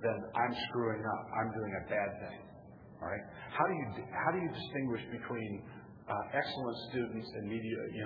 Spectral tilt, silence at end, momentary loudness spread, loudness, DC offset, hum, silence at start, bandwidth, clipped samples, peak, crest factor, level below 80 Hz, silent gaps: -4 dB/octave; 0 s; 12 LU; -38 LUFS; under 0.1%; none; 0 s; 5.2 kHz; under 0.1%; -16 dBFS; 22 dB; -66 dBFS; none